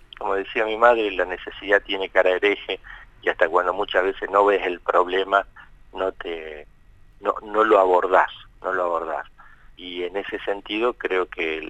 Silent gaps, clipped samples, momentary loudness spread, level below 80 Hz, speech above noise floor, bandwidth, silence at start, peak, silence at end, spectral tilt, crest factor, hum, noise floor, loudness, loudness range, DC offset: none; under 0.1%; 15 LU; -50 dBFS; 28 dB; 9 kHz; 0.2 s; -2 dBFS; 0 s; -4.5 dB/octave; 20 dB; none; -49 dBFS; -22 LUFS; 4 LU; under 0.1%